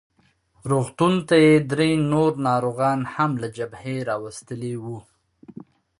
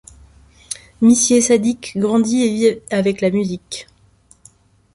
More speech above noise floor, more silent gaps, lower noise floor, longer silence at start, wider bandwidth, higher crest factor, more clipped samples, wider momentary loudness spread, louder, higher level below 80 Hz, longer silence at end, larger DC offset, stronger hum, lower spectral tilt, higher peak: first, 41 dB vs 37 dB; neither; first, -62 dBFS vs -52 dBFS; about the same, 0.65 s vs 0.7 s; about the same, 11.5 kHz vs 11.5 kHz; about the same, 18 dB vs 16 dB; neither; about the same, 16 LU vs 18 LU; second, -22 LUFS vs -16 LUFS; second, -58 dBFS vs -52 dBFS; second, 0.5 s vs 1.1 s; neither; neither; first, -6.5 dB/octave vs -4.5 dB/octave; about the same, -4 dBFS vs -2 dBFS